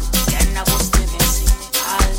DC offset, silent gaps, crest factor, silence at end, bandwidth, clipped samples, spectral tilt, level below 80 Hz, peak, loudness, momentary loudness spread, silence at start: under 0.1%; none; 14 dB; 0 s; 17 kHz; under 0.1%; -3 dB/octave; -18 dBFS; -2 dBFS; -17 LUFS; 3 LU; 0 s